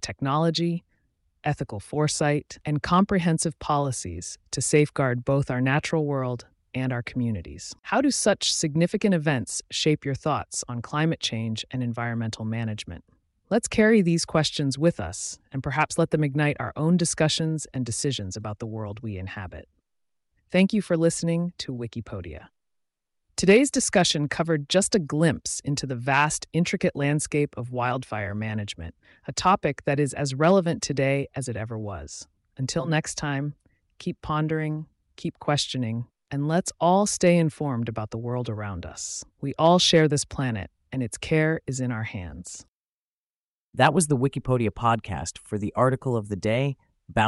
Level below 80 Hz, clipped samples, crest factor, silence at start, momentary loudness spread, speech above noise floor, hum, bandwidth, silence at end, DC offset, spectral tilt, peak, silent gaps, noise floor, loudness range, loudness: -52 dBFS; under 0.1%; 20 dB; 0 s; 14 LU; over 65 dB; none; 11.5 kHz; 0 s; under 0.1%; -5 dB/octave; -4 dBFS; 42.68-43.73 s; under -90 dBFS; 5 LU; -25 LUFS